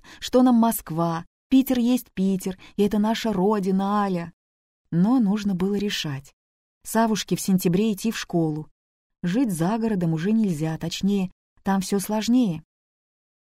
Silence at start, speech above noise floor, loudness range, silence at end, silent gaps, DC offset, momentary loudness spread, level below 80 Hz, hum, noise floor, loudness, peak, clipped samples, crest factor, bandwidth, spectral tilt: 0.1 s; over 68 dB; 2 LU; 0.85 s; 1.27-1.50 s, 4.33-4.85 s, 6.33-6.81 s, 8.71-9.10 s, 11.32-11.56 s; under 0.1%; 9 LU; -54 dBFS; none; under -90 dBFS; -23 LUFS; -6 dBFS; under 0.1%; 16 dB; 16 kHz; -6 dB/octave